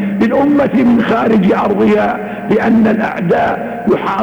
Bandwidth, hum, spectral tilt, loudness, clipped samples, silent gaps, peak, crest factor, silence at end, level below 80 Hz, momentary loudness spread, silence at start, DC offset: 20 kHz; none; -8 dB/octave; -12 LUFS; under 0.1%; none; -6 dBFS; 6 dB; 0 s; -44 dBFS; 5 LU; 0 s; under 0.1%